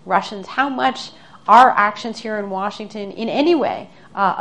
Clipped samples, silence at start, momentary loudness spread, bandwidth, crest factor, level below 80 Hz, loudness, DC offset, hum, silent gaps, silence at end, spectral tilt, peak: under 0.1%; 0.05 s; 19 LU; 10.5 kHz; 18 dB; -62 dBFS; -17 LUFS; 0.4%; none; none; 0 s; -4.5 dB/octave; 0 dBFS